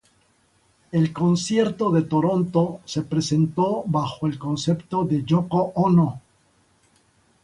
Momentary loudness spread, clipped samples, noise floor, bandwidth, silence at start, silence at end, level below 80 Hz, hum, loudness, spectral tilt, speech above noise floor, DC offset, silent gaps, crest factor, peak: 6 LU; under 0.1%; -62 dBFS; 11 kHz; 0.95 s; 1.25 s; -56 dBFS; none; -22 LUFS; -7 dB/octave; 41 dB; under 0.1%; none; 16 dB; -6 dBFS